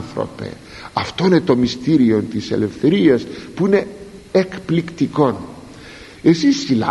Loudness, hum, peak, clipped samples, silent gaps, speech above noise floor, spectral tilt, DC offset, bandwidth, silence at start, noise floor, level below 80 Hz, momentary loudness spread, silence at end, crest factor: -17 LUFS; none; -2 dBFS; under 0.1%; none; 21 dB; -6.5 dB/octave; under 0.1%; 11.5 kHz; 0 s; -38 dBFS; -48 dBFS; 19 LU; 0 s; 16 dB